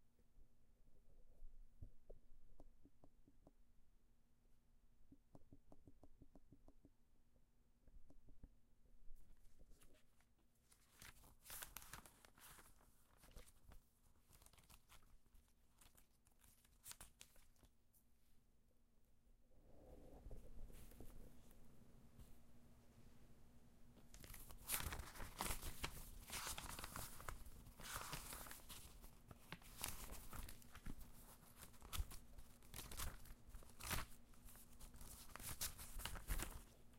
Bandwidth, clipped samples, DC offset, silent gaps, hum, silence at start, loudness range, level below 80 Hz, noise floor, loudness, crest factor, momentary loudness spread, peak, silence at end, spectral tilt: 16 kHz; under 0.1%; under 0.1%; none; none; 0 s; 16 LU; -60 dBFS; -75 dBFS; -54 LUFS; 34 dB; 18 LU; -22 dBFS; 0 s; -2.5 dB/octave